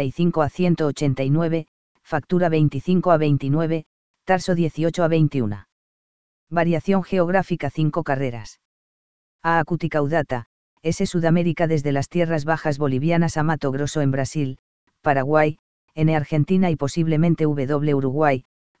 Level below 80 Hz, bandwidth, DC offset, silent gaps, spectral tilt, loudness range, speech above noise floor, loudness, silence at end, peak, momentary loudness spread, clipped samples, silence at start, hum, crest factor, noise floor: -50 dBFS; 8 kHz; 2%; 1.68-1.95 s, 3.86-4.14 s, 5.72-6.47 s, 8.65-9.39 s, 10.46-10.77 s, 14.59-14.87 s, 15.59-15.88 s, 18.45-18.75 s; -7.5 dB/octave; 3 LU; over 70 dB; -21 LUFS; 0 s; -2 dBFS; 8 LU; under 0.1%; 0 s; none; 18 dB; under -90 dBFS